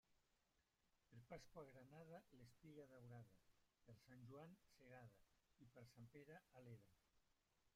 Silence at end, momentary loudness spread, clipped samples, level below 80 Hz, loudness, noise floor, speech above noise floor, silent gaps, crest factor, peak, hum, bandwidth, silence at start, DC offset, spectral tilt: 0.05 s; 5 LU; under 0.1%; -86 dBFS; -65 LUFS; -88 dBFS; 23 dB; none; 20 dB; -46 dBFS; none; 14.5 kHz; 0.05 s; under 0.1%; -6.5 dB/octave